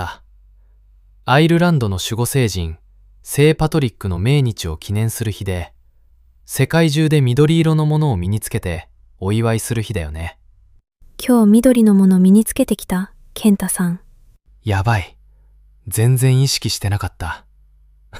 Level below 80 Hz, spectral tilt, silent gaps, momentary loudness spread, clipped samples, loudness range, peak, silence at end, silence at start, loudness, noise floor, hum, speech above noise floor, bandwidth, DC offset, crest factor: -38 dBFS; -6 dB/octave; none; 16 LU; under 0.1%; 6 LU; -2 dBFS; 0 s; 0 s; -16 LUFS; -51 dBFS; none; 35 dB; 16 kHz; under 0.1%; 16 dB